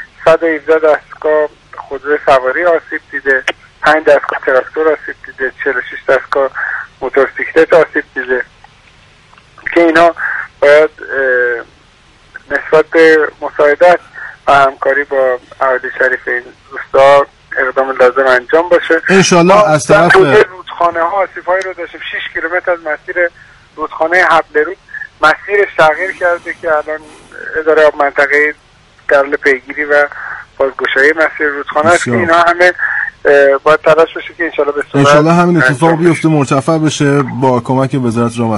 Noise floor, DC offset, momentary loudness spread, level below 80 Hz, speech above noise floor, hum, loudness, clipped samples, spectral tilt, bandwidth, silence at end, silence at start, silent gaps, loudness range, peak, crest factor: -45 dBFS; under 0.1%; 11 LU; -46 dBFS; 34 dB; none; -11 LUFS; 0.3%; -5 dB/octave; 11.5 kHz; 0 s; 0 s; none; 5 LU; 0 dBFS; 12 dB